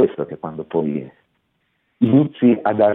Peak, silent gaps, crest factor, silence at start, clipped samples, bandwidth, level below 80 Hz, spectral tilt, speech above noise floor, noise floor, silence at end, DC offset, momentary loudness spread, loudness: -2 dBFS; none; 16 dB; 0 s; under 0.1%; 4 kHz; -62 dBFS; -12 dB/octave; 51 dB; -68 dBFS; 0 s; under 0.1%; 12 LU; -19 LUFS